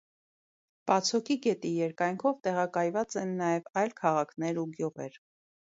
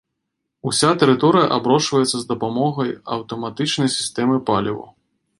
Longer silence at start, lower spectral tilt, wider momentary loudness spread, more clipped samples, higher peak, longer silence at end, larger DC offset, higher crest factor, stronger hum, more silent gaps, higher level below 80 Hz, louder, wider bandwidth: first, 0.85 s vs 0.65 s; about the same, -5 dB/octave vs -4.5 dB/octave; second, 8 LU vs 12 LU; neither; second, -10 dBFS vs -2 dBFS; first, 0.65 s vs 0.5 s; neither; about the same, 20 dB vs 18 dB; neither; first, 3.70-3.74 s vs none; second, -78 dBFS vs -58 dBFS; second, -30 LUFS vs -19 LUFS; second, 8 kHz vs 11.5 kHz